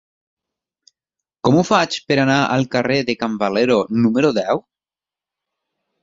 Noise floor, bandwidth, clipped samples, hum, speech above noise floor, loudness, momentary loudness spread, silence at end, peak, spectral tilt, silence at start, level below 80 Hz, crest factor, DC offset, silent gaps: under -90 dBFS; 7.8 kHz; under 0.1%; none; over 73 dB; -17 LUFS; 6 LU; 1.45 s; -2 dBFS; -5.5 dB/octave; 1.45 s; -58 dBFS; 18 dB; under 0.1%; none